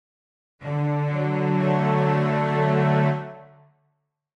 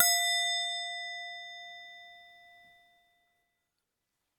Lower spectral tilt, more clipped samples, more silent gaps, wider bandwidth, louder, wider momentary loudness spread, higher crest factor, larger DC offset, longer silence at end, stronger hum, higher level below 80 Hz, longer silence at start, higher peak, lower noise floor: first, -9 dB/octave vs 5.5 dB/octave; neither; neither; second, 6.2 kHz vs 19 kHz; first, -22 LUFS vs -30 LUFS; second, 10 LU vs 23 LU; second, 14 dB vs 28 dB; neither; second, 0.9 s vs 2 s; neither; first, -64 dBFS vs -88 dBFS; first, 0.6 s vs 0 s; about the same, -10 dBFS vs -8 dBFS; second, -73 dBFS vs -85 dBFS